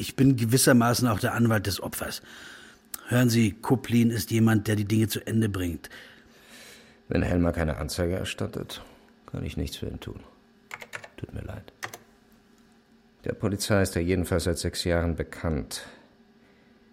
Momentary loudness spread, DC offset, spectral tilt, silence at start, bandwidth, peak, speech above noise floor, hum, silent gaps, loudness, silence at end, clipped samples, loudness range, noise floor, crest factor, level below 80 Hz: 19 LU; under 0.1%; -5.5 dB/octave; 0 s; 16.5 kHz; -8 dBFS; 34 dB; none; none; -26 LUFS; 0.95 s; under 0.1%; 13 LU; -59 dBFS; 20 dB; -44 dBFS